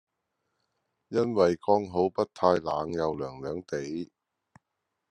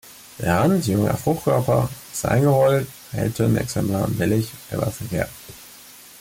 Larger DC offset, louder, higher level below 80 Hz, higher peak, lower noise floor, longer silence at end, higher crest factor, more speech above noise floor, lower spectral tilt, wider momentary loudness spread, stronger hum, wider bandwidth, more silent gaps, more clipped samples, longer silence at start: neither; second, -28 LUFS vs -21 LUFS; second, -66 dBFS vs -46 dBFS; about the same, -8 dBFS vs -8 dBFS; first, -83 dBFS vs -44 dBFS; first, 1.05 s vs 0.2 s; first, 22 dB vs 14 dB; first, 55 dB vs 24 dB; about the same, -6.5 dB/octave vs -6.5 dB/octave; second, 12 LU vs 21 LU; neither; second, 9.8 kHz vs 17 kHz; neither; neither; first, 1.1 s vs 0.05 s